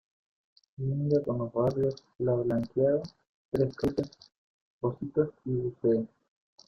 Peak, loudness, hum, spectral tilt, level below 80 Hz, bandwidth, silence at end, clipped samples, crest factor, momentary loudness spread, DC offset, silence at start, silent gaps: -12 dBFS; -30 LUFS; none; -9.5 dB/octave; -58 dBFS; 7.2 kHz; 0.6 s; under 0.1%; 18 dB; 8 LU; under 0.1%; 0.8 s; 3.29-3.52 s, 4.37-4.81 s